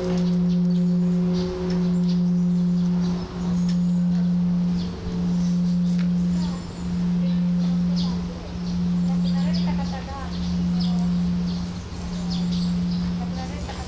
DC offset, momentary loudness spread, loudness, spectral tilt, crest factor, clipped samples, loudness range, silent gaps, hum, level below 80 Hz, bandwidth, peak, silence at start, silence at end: under 0.1%; 8 LU; -23 LUFS; -8 dB/octave; 8 dB; under 0.1%; 3 LU; none; none; -38 dBFS; 8 kHz; -14 dBFS; 0 s; 0 s